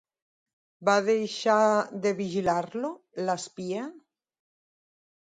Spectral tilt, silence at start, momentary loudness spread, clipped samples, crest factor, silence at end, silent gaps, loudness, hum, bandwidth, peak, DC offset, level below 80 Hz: -4.5 dB/octave; 0.8 s; 12 LU; under 0.1%; 20 dB; 1.3 s; none; -27 LUFS; none; 9.4 kHz; -10 dBFS; under 0.1%; -68 dBFS